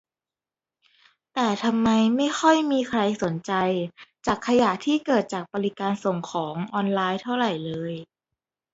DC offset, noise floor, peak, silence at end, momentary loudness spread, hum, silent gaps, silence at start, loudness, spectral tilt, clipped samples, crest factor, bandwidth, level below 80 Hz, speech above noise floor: under 0.1%; under -90 dBFS; -4 dBFS; 0.7 s; 10 LU; none; none; 1.35 s; -24 LUFS; -5.5 dB/octave; under 0.1%; 20 dB; 8 kHz; -62 dBFS; over 67 dB